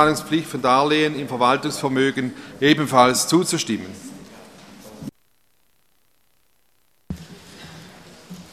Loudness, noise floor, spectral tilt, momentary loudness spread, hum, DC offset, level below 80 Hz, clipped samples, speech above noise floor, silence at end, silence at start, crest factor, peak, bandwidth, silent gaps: -19 LUFS; -66 dBFS; -4 dB/octave; 25 LU; none; under 0.1%; -56 dBFS; under 0.1%; 47 dB; 0.1 s; 0 s; 22 dB; 0 dBFS; 15 kHz; none